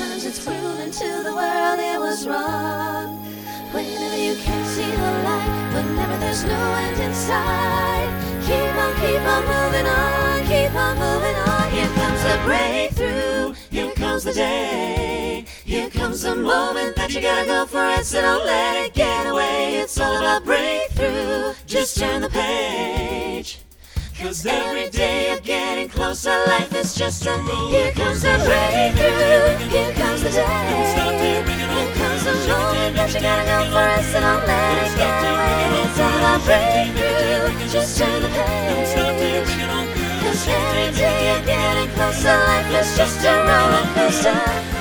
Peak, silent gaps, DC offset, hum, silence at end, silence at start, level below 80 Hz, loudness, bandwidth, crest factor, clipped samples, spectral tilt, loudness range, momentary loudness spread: -2 dBFS; none; under 0.1%; none; 0 s; 0 s; -32 dBFS; -19 LUFS; over 20 kHz; 18 dB; under 0.1%; -4 dB/octave; 6 LU; 8 LU